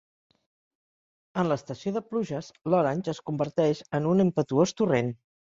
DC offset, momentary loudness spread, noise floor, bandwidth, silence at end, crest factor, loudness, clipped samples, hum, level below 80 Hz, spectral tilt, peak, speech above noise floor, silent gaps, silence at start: under 0.1%; 9 LU; under -90 dBFS; 7.8 kHz; 0.3 s; 18 dB; -27 LUFS; under 0.1%; none; -66 dBFS; -7 dB/octave; -8 dBFS; over 64 dB; none; 1.35 s